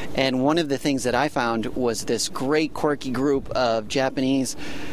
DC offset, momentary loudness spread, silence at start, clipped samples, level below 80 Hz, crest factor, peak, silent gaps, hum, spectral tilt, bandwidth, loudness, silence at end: 1%; 3 LU; 0 s; under 0.1%; -48 dBFS; 18 dB; -4 dBFS; none; none; -4.5 dB/octave; 16 kHz; -23 LUFS; 0 s